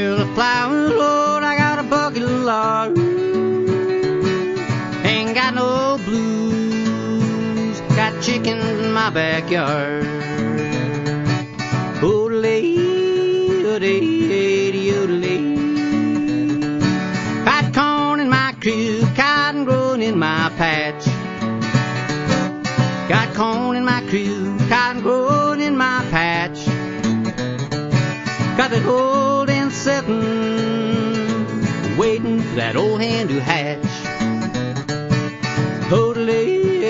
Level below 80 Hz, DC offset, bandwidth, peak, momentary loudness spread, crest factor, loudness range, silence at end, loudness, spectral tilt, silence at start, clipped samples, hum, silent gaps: -48 dBFS; under 0.1%; 7.8 kHz; 0 dBFS; 5 LU; 18 dB; 3 LU; 0 s; -18 LUFS; -6 dB/octave; 0 s; under 0.1%; none; none